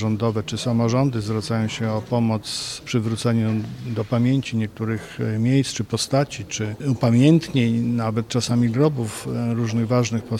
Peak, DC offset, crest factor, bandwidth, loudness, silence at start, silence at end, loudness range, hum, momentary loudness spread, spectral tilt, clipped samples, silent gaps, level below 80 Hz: -4 dBFS; under 0.1%; 16 dB; 13 kHz; -22 LUFS; 0 s; 0 s; 3 LU; none; 8 LU; -6 dB/octave; under 0.1%; none; -52 dBFS